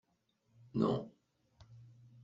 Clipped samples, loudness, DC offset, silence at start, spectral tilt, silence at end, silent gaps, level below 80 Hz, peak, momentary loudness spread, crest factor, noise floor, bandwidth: under 0.1%; -37 LUFS; under 0.1%; 0.75 s; -8 dB/octave; 0.4 s; none; -70 dBFS; -18 dBFS; 25 LU; 22 dB; -78 dBFS; 7.6 kHz